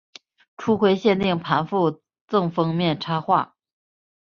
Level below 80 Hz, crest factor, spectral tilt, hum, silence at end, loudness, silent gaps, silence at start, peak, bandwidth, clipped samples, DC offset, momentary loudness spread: -60 dBFS; 18 dB; -7.5 dB/octave; none; 0.8 s; -22 LUFS; 2.21-2.28 s; 0.6 s; -4 dBFS; 7 kHz; under 0.1%; under 0.1%; 6 LU